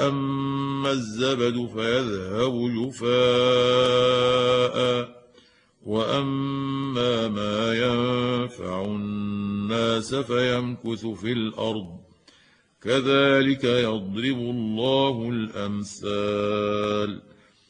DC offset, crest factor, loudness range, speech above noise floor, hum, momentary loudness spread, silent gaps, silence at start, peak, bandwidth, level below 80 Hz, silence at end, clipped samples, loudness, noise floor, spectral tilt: under 0.1%; 16 dB; 5 LU; 35 dB; none; 10 LU; none; 0 s; -8 dBFS; 10.5 kHz; -58 dBFS; 0.5 s; under 0.1%; -24 LUFS; -59 dBFS; -5.5 dB/octave